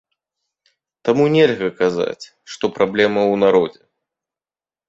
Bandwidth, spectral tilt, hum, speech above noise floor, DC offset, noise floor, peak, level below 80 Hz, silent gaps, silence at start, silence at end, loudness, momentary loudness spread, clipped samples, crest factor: 8 kHz; -6 dB/octave; none; over 74 dB; under 0.1%; under -90 dBFS; -2 dBFS; -60 dBFS; none; 1.05 s; 1.15 s; -17 LUFS; 11 LU; under 0.1%; 18 dB